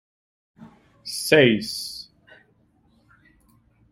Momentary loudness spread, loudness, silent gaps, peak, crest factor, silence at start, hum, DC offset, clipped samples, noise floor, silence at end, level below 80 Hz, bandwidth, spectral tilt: 23 LU; -21 LUFS; none; -2 dBFS; 24 dB; 0.6 s; none; under 0.1%; under 0.1%; -62 dBFS; 1.9 s; -62 dBFS; 16 kHz; -4 dB/octave